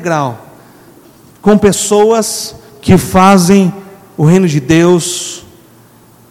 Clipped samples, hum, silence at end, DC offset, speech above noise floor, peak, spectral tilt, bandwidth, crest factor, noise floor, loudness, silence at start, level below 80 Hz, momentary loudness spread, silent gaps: 1%; none; 0.9 s; under 0.1%; 33 dB; 0 dBFS; -5.5 dB/octave; 16 kHz; 10 dB; -42 dBFS; -10 LUFS; 0 s; -38 dBFS; 16 LU; none